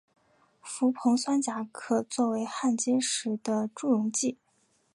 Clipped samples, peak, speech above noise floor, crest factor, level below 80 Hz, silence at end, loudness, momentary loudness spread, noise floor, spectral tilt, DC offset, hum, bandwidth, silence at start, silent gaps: under 0.1%; -12 dBFS; 42 dB; 16 dB; -82 dBFS; 0.6 s; -29 LUFS; 7 LU; -70 dBFS; -3.5 dB/octave; under 0.1%; none; 11.5 kHz; 0.65 s; none